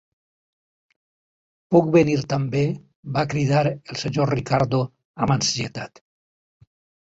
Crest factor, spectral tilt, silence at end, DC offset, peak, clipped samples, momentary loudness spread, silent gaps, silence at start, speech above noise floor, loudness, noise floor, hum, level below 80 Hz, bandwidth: 20 dB; -5.5 dB/octave; 1.15 s; under 0.1%; -2 dBFS; under 0.1%; 12 LU; 2.96-3.03 s, 5.05-5.14 s; 1.7 s; over 69 dB; -22 LUFS; under -90 dBFS; none; -52 dBFS; 8 kHz